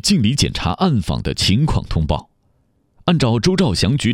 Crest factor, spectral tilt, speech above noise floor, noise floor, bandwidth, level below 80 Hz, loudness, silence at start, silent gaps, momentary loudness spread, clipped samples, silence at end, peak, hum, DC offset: 16 dB; -5 dB/octave; 44 dB; -61 dBFS; 16 kHz; -30 dBFS; -17 LUFS; 0.05 s; none; 6 LU; under 0.1%; 0 s; -2 dBFS; none; under 0.1%